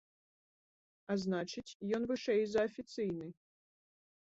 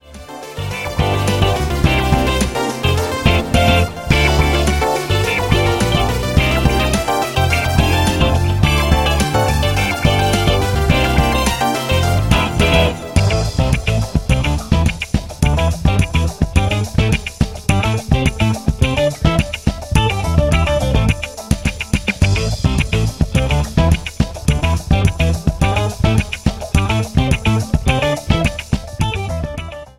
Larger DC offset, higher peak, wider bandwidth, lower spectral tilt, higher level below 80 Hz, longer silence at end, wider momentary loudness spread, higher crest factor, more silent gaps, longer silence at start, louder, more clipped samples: neither; second, -22 dBFS vs 0 dBFS; second, 8 kHz vs 17 kHz; about the same, -5 dB/octave vs -5.5 dB/octave; second, -72 dBFS vs -22 dBFS; first, 1 s vs 0.15 s; first, 11 LU vs 6 LU; about the same, 16 dB vs 14 dB; first, 1.75-1.80 s vs none; first, 1.1 s vs 0.05 s; second, -37 LUFS vs -16 LUFS; neither